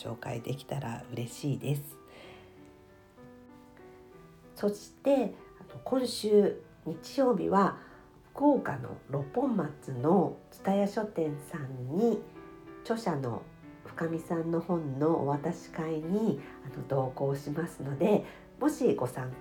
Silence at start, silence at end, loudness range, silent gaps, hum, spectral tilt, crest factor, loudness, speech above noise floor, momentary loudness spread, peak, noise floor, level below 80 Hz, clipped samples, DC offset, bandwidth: 0 s; 0 s; 9 LU; none; none; -7 dB/octave; 20 dB; -31 LUFS; 26 dB; 20 LU; -12 dBFS; -56 dBFS; -64 dBFS; under 0.1%; under 0.1%; 19 kHz